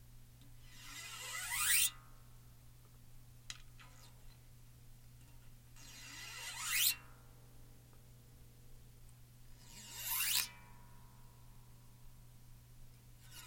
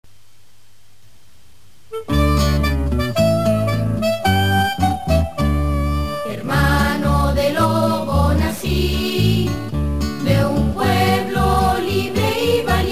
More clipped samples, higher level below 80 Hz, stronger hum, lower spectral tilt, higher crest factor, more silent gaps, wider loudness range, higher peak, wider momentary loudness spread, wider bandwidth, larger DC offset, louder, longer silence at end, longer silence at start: neither; second, -60 dBFS vs -24 dBFS; neither; second, 0.5 dB/octave vs -6 dB/octave; first, 30 dB vs 14 dB; neither; first, 19 LU vs 2 LU; second, -14 dBFS vs -4 dBFS; first, 29 LU vs 5 LU; about the same, 16.5 kHz vs 15.5 kHz; second, under 0.1% vs 2%; second, -36 LUFS vs -18 LUFS; about the same, 0 s vs 0 s; second, 0 s vs 1.9 s